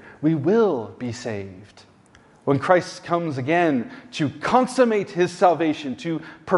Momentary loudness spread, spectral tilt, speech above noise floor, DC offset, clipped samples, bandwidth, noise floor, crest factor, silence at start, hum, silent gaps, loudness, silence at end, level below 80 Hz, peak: 12 LU; -6.5 dB/octave; 31 dB; under 0.1%; under 0.1%; 11.5 kHz; -53 dBFS; 20 dB; 0.05 s; none; none; -22 LUFS; 0 s; -62 dBFS; -2 dBFS